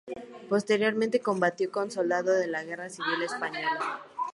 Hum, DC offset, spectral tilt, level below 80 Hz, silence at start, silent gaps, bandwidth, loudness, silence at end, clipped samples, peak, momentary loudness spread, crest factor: none; under 0.1%; -4.5 dB/octave; -78 dBFS; 0.05 s; none; 11.5 kHz; -29 LUFS; 0 s; under 0.1%; -10 dBFS; 9 LU; 18 dB